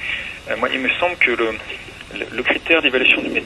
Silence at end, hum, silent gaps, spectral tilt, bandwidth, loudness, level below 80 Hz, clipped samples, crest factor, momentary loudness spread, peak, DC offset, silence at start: 0 s; none; none; -4 dB/octave; 12.5 kHz; -17 LUFS; -48 dBFS; under 0.1%; 20 dB; 15 LU; 0 dBFS; under 0.1%; 0 s